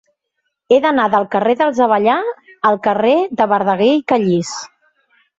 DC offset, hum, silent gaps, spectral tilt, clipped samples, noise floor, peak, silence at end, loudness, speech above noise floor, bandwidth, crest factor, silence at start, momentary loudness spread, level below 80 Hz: under 0.1%; none; none; -5.5 dB/octave; under 0.1%; -72 dBFS; 0 dBFS; 0.75 s; -15 LUFS; 58 dB; 8 kHz; 14 dB; 0.7 s; 6 LU; -60 dBFS